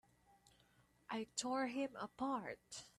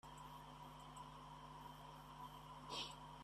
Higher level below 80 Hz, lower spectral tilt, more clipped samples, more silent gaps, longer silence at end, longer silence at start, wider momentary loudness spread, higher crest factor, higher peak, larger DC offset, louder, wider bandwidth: second, -80 dBFS vs -70 dBFS; about the same, -3 dB/octave vs -3.5 dB/octave; neither; neither; about the same, 0.1 s vs 0 s; first, 1.1 s vs 0.05 s; about the same, 8 LU vs 9 LU; about the same, 22 dB vs 20 dB; first, -26 dBFS vs -36 dBFS; neither; first, -44 LUFS vs -55 LUFS; about the same, 13 kHz vs 14 kHz